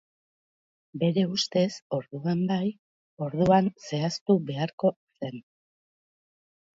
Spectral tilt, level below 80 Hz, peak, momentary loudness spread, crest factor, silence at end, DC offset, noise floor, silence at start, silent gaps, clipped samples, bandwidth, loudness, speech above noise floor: -6.5 dB/octave; -64 dBFS; -8 dBFS; 15 LU; 20 dB; 1.35 s; under 0.1%; under -90 dBFS; 0.95 s; 1.82-1.90 s, 2.79-3.17 s, 4.21-4.26 s, 4.73-4.78 s, 4.96-5.07 s; under 0.1%; 7.8 kHz; -27 LUFS; over 64 dB